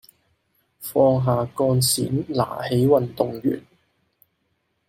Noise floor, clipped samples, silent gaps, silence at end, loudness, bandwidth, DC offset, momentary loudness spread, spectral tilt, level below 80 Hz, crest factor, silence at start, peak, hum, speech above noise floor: -71 dBFS; under 0.1%; none; 1.3 s; -21 LUFS; 16.5 kHz; under 0.1%; 8 LU; -5.5 dB/octave; -60 dBFS; 18 dB; 0.8 s; -6 dBFS; none; 51 dB